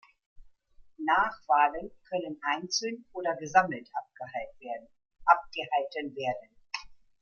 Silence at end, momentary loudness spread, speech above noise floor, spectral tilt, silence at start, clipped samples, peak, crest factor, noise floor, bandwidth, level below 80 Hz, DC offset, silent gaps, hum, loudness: 0.25 s; 15 LU; 27 dB; -3 dB/octave; 0.4 s; under 0.1%; -6 dBFS; 24 dB; -57 dBFS; 7.2 kHz; -64 dBFS; under 0.1%; none; none; -30 LUFS